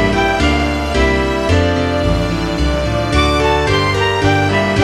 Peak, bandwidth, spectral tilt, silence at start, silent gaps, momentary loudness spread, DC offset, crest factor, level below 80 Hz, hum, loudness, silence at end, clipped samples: 0 dBFS; 14 kHz; -5.5 dB/octave; 0 s; none; 4 LU; 0.3%; 14 dB; -22 dBFS; none; -14 LUFS; 0 s; under 0.1%